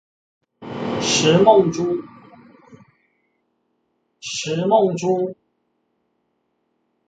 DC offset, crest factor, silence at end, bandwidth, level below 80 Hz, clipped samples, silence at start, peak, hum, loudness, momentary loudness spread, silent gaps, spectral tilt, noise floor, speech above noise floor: under 0.1%; 22 dB; 1.75 s; 9.2 kHz; -60 dBFS; under 0.1%; 0.6 s; 0 dBFS; none; -18 LUFS; 15 LU; none; -4.5 dB/octave; -71 dBFS; 54 dB